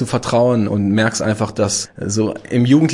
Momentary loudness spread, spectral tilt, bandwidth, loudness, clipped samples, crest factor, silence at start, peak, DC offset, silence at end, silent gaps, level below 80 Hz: 6 LU; -5.5 dB/octave; 11.5 kHz; -17 LUFS; under 0.1%; 14 dB; 0 s; -2 dBFS; under 0.1%; 0 s; none; -50 dBFS